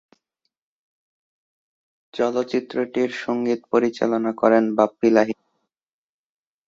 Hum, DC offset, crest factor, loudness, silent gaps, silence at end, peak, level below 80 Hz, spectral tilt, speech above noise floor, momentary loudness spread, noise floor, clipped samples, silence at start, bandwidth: none; under 0.1%; 20 dB; -21 LUFS; none; 1.35 s; -2 dBFS; -68 dBFS; -6 dB/octave; 67 dB; 8 LU; -87 dBFS; under 0.1%; 2.15 s; 7.6 kHz